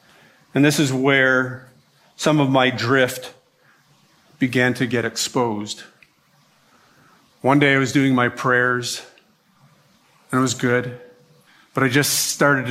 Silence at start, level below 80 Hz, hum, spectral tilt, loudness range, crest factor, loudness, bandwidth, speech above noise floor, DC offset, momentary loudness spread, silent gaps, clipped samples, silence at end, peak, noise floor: 0.55 s; -64 dBFS; none; -4.5 dB/octave; 5 LU; 18 dB; -19 LUFS; 16 kHz; 40 dB; under 0.1%; 13 LU; none; under 0.1%; 0 s; -2 dBFS; -59 dBFS